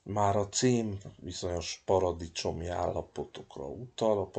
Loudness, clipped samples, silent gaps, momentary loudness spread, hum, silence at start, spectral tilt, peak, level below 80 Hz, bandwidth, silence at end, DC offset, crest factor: -32 LUFS; under 0.1%; none; 14 LU; none; 0.05 s; -5 dB/octave; -14 dBFS; -54 dBFS; 9.4 kHz; 0 s; under 0.1%; 18 dB